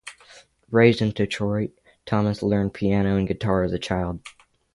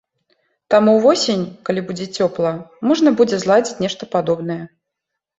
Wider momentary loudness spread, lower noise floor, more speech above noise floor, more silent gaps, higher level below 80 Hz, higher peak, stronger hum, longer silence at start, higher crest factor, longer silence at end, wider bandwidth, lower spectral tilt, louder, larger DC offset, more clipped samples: about the same, 11 LU vs 10 LU; second, -51 dBFS vs -80 dBFS; second, 29 dB vs 63 dB; neither; first, -44 dBFS vs -60 dBFS; about the same, -2 dBFS vs -2 dBFS; neither; second, 0.05 s vs 0.7 s; first, 22 dB vs 16 dB; second, 0.45 s vs 0.7 s; first, 11.5 kHz vs 8 kHz; first, -7 dB/octave vs -5 dB/octave; second, -23 LUFS vs -17 LUFS; neither; neither